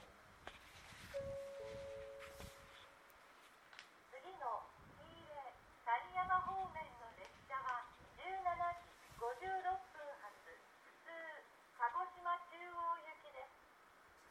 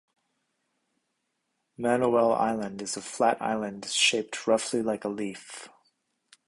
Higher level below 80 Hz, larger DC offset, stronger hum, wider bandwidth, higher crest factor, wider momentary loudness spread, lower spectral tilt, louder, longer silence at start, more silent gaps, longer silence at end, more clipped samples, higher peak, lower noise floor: about the same, -72 dBFS vs -68 dBFS; neither; neither; first, 16.5 kHz vs 11.5 kHz; about the same, 22 dB vs 20 dB; first, 20 LU vs 12 LU; about the same, -4 dB/octave vs -3 dB/octave; second, -46 LUFS vs -27 LUFS; second, 0 s vs 1.8 s; neither; second, 0 s vs 0.8 s; neither; second, -26 dBFS vs -10 dBFS; second, -67 dBFS vs -79 dBFS